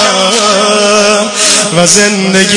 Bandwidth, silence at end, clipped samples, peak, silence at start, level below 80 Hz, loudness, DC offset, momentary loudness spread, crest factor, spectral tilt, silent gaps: 12 kHz; 0 s; 1%; 0 dBFS; 0 s; -46 dBFS; -6 LUFS; under 0.1%; 3 LU; 8 dB; -2 dB/octave; none